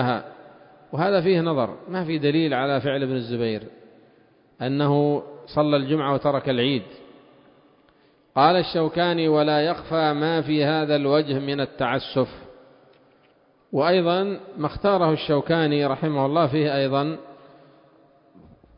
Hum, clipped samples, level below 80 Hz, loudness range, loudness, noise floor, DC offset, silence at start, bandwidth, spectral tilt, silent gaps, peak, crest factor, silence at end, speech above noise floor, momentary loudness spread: none; under 0.1%; -58 dBFS; 4 LU; -22 LUFS; -59 dBFS; under 0.1%; 0 s; 5.4 kHz; -11 dB/octave; none; -4 dBFS; 20 dB; 1.45 s; 38 dB; 9 LU